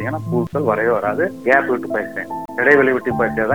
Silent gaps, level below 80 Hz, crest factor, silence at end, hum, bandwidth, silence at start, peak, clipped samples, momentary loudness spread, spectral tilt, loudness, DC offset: none; -52 dBFS; 18 dB; 0 s; none; over 20 kHz; 0 s; 0 dBFS; under 0.1%; 10 LU; -8 dB/octave; -18 LUFS; 0.4%